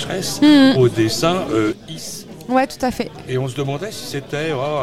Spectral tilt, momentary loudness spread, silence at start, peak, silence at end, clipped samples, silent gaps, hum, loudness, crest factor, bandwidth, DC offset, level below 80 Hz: -5 dB/octave; 17 LU; 0 s; 0 dBFS; 0 s; under 0.1%; none; none; -18 LUFS; 18 dB; 15.5 kHz; 0.5%; -48 dBFS